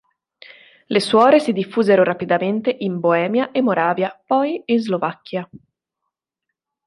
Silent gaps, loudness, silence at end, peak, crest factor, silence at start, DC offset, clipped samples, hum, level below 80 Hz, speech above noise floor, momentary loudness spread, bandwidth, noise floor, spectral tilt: none; -18 LUFS; 1.3 s; -2 dBFS; 18 dB; 0.9 s; under 0.1%; under 0.1%; none; -68 dBFS; 63 dB; 10 LU; 11.5 kHz; -81 dBFS; -6 dB/octave